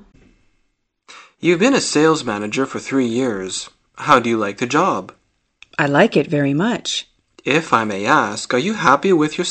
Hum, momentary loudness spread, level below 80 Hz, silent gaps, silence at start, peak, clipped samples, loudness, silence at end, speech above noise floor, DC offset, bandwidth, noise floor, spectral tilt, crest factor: none; 10 LU; -58 dBFS; none; 1.1 s; 0 dBFS; under 0.1%; -17 LUFS; 0 s; 50 dB; under 0.1%; 8.8 kHz; -67 dBFS; -4.5 dB/octave; 18 dB